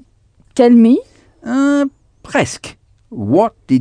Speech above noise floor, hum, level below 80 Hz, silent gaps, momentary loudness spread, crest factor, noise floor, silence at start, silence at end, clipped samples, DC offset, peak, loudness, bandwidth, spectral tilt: 40 dB; none; -52 dBFS; none; 20 LU; 14 dB; -52 dBFS; 0.55 s; 0 s; under 0.1%; under 0.1%; 0 dBFS; -14 LUFS; 10 kHz; -6 dB/octave